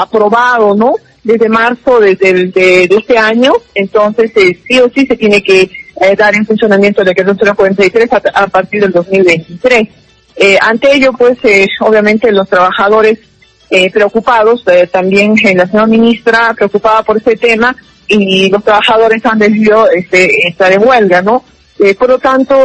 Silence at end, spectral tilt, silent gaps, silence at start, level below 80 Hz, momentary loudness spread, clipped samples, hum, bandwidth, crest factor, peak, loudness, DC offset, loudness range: 0 s; -5 dB/octave; none; 0 s; -44 dBFS; 4 LU; 1%; none; 11 kHz; 8 dB; 0 dBFS; -7 LUFS; under 0.1%; 1 LU